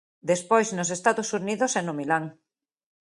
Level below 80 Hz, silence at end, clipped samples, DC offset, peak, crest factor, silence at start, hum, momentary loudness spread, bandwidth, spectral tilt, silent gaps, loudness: -74 dBFS; 0.75 s; under 0.1%; under 0.1%; -6 dBFS; 22 dB; 0.25 s; none; 5 LU; 11.5 kHz; -4 dB/octave; none; -25 LUFS